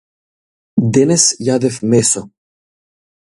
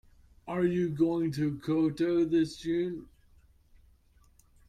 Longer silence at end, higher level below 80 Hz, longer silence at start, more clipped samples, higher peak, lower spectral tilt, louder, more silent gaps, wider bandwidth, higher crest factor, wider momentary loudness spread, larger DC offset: second, 0.95 s vs 1.65 s; first, -52 dBFS vs -60 dBFS; first, 0.75 s vs 0.45 s; neither; first, 0 dBFS vs -16 dBFS; second, -4.5 dB/octave vs -7.5 dB/octave; first, -13 LUFS vs -30 LUFS; neither; about the same, 11.5 kHz vs 11.5 kHz; about the same, 16 dB vs 16 dB; about the same, 8 LU vs 9 LU; neither